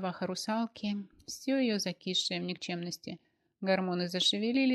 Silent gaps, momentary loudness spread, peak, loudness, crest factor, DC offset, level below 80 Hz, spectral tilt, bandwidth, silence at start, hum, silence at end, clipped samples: none; 12 LU; -16 dBFS; -32 LUFS; 18 dB; under 0.1%; -76 dBFS; -4 dB/octave; 13.5 kHz; 0 s; none; 0 s; under 0.1%